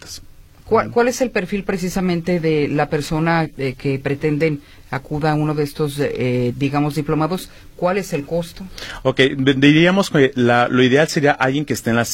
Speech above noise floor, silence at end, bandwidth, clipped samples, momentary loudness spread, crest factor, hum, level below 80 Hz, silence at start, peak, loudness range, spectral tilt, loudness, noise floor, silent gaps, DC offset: 24 dB; 0 s; 16.5 kHz; under 0.1%; 11 LU; 18 dB; none; -42 dBFS; 0 s; 0 dBFS; 6 LU; -5.5 dB/octave; -18 LUFS; -41 dBFS; none; under 0.1%